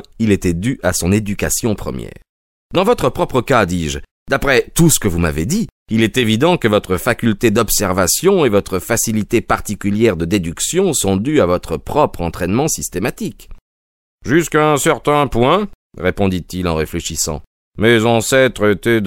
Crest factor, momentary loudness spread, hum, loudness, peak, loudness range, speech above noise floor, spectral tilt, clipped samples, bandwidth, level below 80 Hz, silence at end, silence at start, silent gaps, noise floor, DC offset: 16 dB; 8 LU; none; -15 LUFS; 0 dBFS; 3 LU; over 75 dB; -4.5 dB/octave; under 0.1%; 16.5 kHz; -34 dBFS; 0 s; 0.2 s; 2.29-2.70 s, 4.11-4.26 s, 5.72-5.86 s, 13.61-14.18 s, 15.75-15.90 s, 17.47-17.72 s; under -90 dBFS; under 0.1%